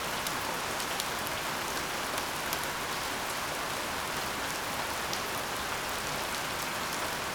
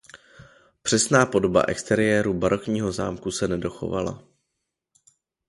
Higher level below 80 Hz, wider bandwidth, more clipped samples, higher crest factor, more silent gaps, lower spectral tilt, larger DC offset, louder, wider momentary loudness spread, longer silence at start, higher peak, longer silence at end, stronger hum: second, -56 dBFS vs -50 dBFS; first, over 20 kHz vs 11.5 kHz; neither; about the same, 24 dB vs 20 dB; neither; second, -1.5 dB/octave vs -4.5 dB/octave; neither; second, -32 LUFS vs -23 LUFS; second, 1 LU vs 10 LU; second, 0 s vs 0.15 s; second, -10 dBFS vs -4 dBFS; second, 0 s vs 1.3 s; neither